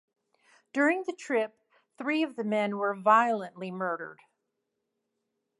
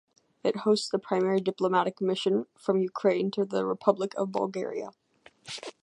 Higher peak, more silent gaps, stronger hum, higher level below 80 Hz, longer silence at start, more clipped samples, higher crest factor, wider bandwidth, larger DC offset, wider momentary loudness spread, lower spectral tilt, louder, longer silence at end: second, -10 dBFS vs -6 dBFS; neither; neither; second, -88 dBFS vs -80 dBFS; first, 0.75 s vs 0.45 s; neither; about the same, 22 dB vs 22 dB; about the same, 11.5 kHz vs 11 kHz; neither; first, 14 LU vs 9 LU; about the same, -5.5 dB/octave vs -5.5 dB/octave; about the same, -29 LUFS vs -28 LUFS; first, 1.45 s vs 0.15 s